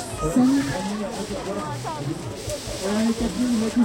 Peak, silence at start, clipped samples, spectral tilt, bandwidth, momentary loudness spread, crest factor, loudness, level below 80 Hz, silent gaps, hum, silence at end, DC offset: -8 dBFS; 0 s; under 0.1%; -5 dB/octave; 16.5 kHz; 10 LU; 16 dB; -25 LUFS; -42 dBFS; none; none; 0 s; under 0.1%